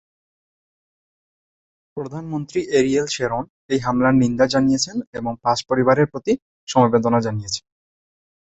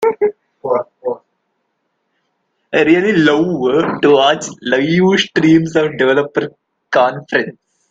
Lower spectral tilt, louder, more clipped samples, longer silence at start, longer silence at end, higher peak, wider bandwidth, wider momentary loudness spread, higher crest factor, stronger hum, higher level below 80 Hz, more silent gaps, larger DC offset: about the same, -5.5 dB/octave vs -5.5 dB/octave; second, -20 LUFS vs -14 LUFS; neither; first, 1.95 s vs 0 s; first, 0.95 s vs 0.4 s; about the same, -2 dBFS vs 0 dBFS; about the same, 8.2 kHz vs 7.8 kHz; about the same, 12 LU vs 12 LU; first, 20 dB vs 14 dB; neither; about the same, -52 dBFS vs -56 dBFS; first, 3.50-3.69 s, 5.07-5.13 s, 6.42-6.67 s vs none; neither